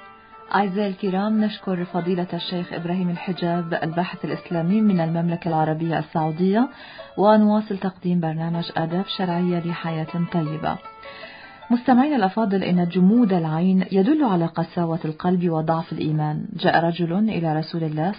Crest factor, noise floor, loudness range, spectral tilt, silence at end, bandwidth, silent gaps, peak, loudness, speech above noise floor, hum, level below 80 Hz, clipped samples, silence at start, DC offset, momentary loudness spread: 18 dB; -44 dBFS; 5 LU; -12 dB/octave; 0 s; 5.2 kHz; none; -2 dBFS; -22 LUFS; 23 dB; none; -60 dBFS; under 0.1%; 0 s; under 0.1%; 9 LU